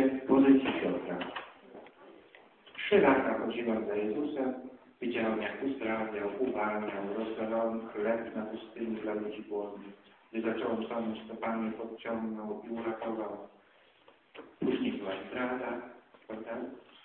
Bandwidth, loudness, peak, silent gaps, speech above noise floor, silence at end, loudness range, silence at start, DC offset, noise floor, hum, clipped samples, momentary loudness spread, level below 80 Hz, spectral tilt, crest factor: 4.2 kHz; -33 LUFS; -12 dBFS; none; 30 dB; 0.25 s; 7 LU; 0 s; under 0.1%; -63 dBFS; none; under 0.1%; 18 LU; -70 dBFS; -9.5 dB/octave; 22 dB